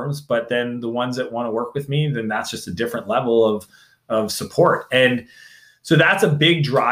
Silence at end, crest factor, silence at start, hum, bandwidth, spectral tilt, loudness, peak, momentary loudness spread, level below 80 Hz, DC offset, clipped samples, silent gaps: 0 s; 18 dB; 0 s; none; 16 kHz; -5 dB/octave; -19 LUFS; -2 dBFS; 10 LU; -60 dBFS; under 0.1%; under 0.1%; none